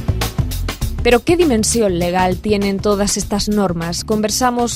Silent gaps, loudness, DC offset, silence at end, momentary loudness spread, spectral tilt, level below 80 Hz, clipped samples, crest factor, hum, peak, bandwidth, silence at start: none; -16 LUFS; under 0.1%; 0 s; 8 LU; -4.5 dB/octave; -28 dBFS; under 0.1%; 16 dB; none; 0 dBFS; 16 kHz; 0 s